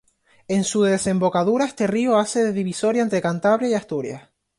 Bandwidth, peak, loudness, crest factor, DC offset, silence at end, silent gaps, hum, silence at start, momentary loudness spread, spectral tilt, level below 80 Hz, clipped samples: 11.5 kHz; -6 dBFS; -21 LUFS; 14 dB; under 0.1%; 0.4 s; none; none; 0.5 s; 6 LU; -5 dB/octave; -60 dBFS; under 0.1%